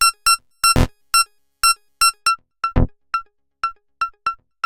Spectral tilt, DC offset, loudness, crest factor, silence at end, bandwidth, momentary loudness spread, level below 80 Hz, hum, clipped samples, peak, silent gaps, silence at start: -2 dB/octave; under 0.1%; -19 LUFS; 16 dB; 0.3 s; 17 kHz; 11 LU; -30 dBFS; none; under 0.1%; -4 dBFS; none; 0 s